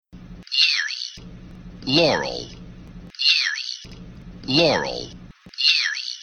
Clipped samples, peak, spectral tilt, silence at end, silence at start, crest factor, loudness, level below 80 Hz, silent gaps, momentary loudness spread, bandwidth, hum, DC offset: under 0.1%; -2 dBFS; -3 dB/octave; 0 s; 0.15 s; 22 dB; -19 LUFS; -48 dBFS; none; 23 LU; 12.5 kHz; none; under 0.1%